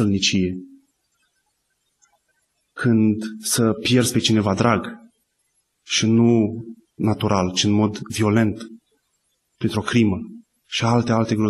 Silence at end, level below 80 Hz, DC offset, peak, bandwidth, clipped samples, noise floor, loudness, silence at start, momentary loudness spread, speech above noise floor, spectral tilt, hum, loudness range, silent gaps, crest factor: 0 s; -54 dBFS; under 0.1%; -4 dBFS; 12.5 kHz; under 0.1%; -71 dBFS; -20 LUFS; 0 s; 13 LU; 52 dB; -5 dB/octave; none; 4 LU; none; 18 dB